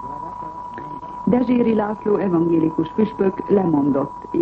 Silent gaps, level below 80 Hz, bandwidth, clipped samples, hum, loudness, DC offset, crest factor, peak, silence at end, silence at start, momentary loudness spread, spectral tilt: none; -50 dBFS; 5.2 kHz; under 0.1%; none; -19 LUFS; under 0.1%; 14 dB; -6 dBFS; 0 s; 0 s; 14 LU; -10 dB/octave